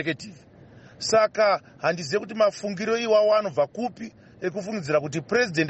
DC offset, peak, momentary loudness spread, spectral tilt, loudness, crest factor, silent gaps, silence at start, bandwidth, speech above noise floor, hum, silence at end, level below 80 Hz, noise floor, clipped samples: under 0.1%; -10 dBFS; 13 LU; -4.5 dB/octave; -24 LUFS; 16 dB; none; 0 s; 8.4 kHz; 25 dB; none; 0 s; -64 dBFS; -49 dBFS; under 0.1%